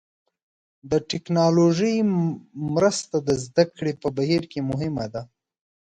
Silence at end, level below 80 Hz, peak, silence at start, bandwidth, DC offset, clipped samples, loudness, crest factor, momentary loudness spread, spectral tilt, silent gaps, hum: 0.6 s; -56 dBFS; -4 dBFS; 0.85 s; 9.4 kHz; under 0.1%; under 0.1%; -23 LUFS; 18 dB; 9 LU; -6 dB/octave; none; none